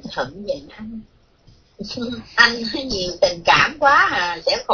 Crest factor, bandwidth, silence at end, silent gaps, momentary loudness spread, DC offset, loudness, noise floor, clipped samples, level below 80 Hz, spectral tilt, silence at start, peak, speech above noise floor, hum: 20 dB; 5.4 kHz; 0 s; none; 21 LU; under 0.1%; -17 LUFS; -52 dBFS; under 0.1%; -46 dBFS; -3 dB/octave; 0 s; 0 dBFS; 33 dB; none